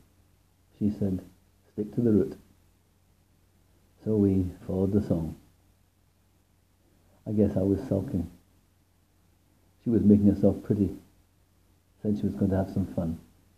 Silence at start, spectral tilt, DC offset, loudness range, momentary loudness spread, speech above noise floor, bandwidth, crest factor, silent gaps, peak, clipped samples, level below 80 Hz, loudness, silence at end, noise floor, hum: 0.8 s; -10.5 dB/octave; under 0.1%; 5 LU; 15 LU; 40 dB; 6.8 kHz; 22 dB; none; -6 dBFS; under 0.1%; -58 dBFS; -27 LUFS; 0.4 s; -66 dBFS; none